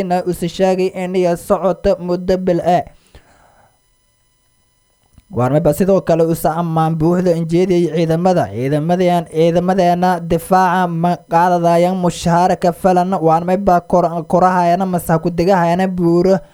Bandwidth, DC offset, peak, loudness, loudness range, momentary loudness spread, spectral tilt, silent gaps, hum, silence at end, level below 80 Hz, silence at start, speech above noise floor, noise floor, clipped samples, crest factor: 17 kHz; under 0.1%; 0 dBFS; -15 LUFS; 6 LU; 4 LU; -7 dB/octave; none; none; 0.1 s; -42 dBFS; 0 s; 45 dB; -59 dBFS; under 0.1%; 14 dB